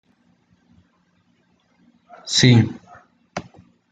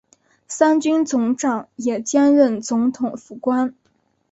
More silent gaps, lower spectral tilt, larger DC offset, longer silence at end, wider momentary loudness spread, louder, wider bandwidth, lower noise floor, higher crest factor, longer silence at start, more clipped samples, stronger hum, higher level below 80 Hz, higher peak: neither; about the same, -5 dB/octave vs -4.5 dB/octave; neither; about the same, 0.5 s vs 0.6 s; first, 24 LU vs 11 LU; first, -16 LUFS vs -19 LUFS; first, 9.4 kHz vs 8.2 kHz; about the same, -63 dBFS vs -65 dBFS; about the same, 22 dB vs 18 dB; first, 2.25 s vs 0.5 s; neither; neither; first, -56 dBFS vs -66 dBFS; about the same, -2 dBFS vs -2 dBFS